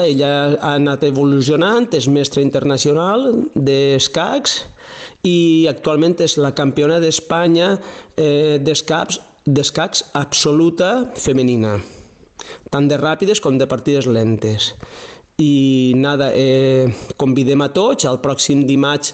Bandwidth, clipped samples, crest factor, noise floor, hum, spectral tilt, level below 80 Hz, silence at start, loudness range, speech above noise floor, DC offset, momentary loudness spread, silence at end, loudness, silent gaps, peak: 9 kHz; under 0.1%; 10 dB; -36 dBFS; none; -5 dB/octave; -48 dBFS; 0 s; 2 LU; 23 dB; under 0.1%; 7 LU; 0 s; -13 LUFS; none; -2 dBFS